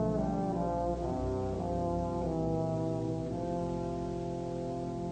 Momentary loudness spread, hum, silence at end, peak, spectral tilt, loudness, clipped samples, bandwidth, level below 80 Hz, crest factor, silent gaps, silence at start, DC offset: 4 LU; none; 0 s; -20 dBFS; -8.5 dB/octave; -34 LUFS; under 0.1%; 9 kHz; -46 dBFS; 14 dB; none; 0 s; under 0.1%